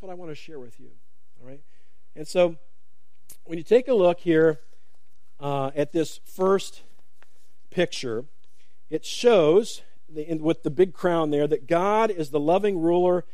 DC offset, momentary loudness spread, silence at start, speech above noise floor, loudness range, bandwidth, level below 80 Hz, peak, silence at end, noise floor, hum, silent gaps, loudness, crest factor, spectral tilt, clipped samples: 2%; 18 LU; 0.05 s; 49 dB; 6 LU; 15 kHz; -68 dBFS; -6 dBFS; 0.15 s; -72 dBFS; none; none; -23 LUFS; 18 dB; -6 dB/octave; under 0.1%